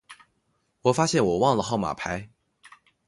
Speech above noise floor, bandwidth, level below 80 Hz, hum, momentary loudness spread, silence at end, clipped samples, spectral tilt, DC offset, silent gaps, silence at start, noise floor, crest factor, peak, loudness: 49 dB; 11.5 kHz; -54 dBFS; none; 10 LU; 0.8 s; under 0.1%; -5 dB/octave; under 0.1%; none; 0.1 s; -72 dBFS; 20 dB; -6 dBFS; -24 LUFS